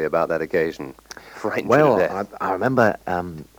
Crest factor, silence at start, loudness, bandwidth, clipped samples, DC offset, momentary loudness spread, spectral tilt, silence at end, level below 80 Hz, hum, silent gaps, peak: 18 dB; 0 s; -21 LUFS; over 20 kHz; under 0.1%; under 0.1%; 18 LU; -6.5 dB/octave; 0.15 s; -54 dBFS; none; none; -2 dBFS